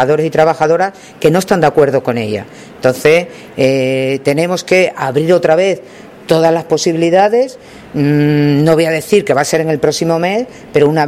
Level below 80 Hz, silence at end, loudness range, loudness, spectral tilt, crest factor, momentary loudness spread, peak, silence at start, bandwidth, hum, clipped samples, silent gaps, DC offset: -50 dBFS; 0 s; 1 LU; -12 LUFS; -5.5 dB/octave; 12 dB; 7 LU; 0 dBFS; 0 s; 15.5 kHz; none; under 0.1%; none; under 0.1%